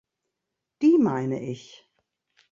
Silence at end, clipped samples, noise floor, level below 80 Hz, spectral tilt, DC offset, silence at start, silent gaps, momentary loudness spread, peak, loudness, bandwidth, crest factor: 0.9 s; under 0.1%; -84 dBFS; -70 dBFS; -8 dB/octave; under 0.1%; 0.8 s; none; 16 LU; -10 dBFS; -23 LUFS; 7.4 kHz; 16 dB